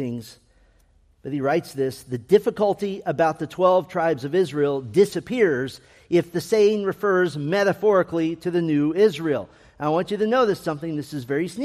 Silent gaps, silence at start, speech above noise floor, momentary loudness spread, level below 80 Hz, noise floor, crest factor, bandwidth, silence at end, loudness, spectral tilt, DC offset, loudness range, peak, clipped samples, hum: none; 0 s; 37 dB; 10 LU; -60 dBFS; -58 dBFS; 18 dB; 15 kHz; 0 s; -22 LUFS; -6.5 dB/octave; under 0.1%; 2 LU; -4 dBFS; under 0.1%; none